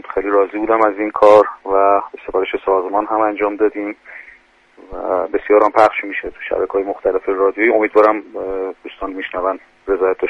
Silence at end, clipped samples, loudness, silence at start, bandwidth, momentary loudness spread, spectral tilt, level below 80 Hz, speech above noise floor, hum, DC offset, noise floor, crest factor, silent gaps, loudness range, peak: 0 s; under 0.1%; -16 LUFS; 0.05 s; 8.2 kHz; 14 LU; -6 dB/octave; -48 dBFS; 32 dB; none; under 0.1%; -48 dBFS; 16 dB; none; 4 LU; 0 dBFS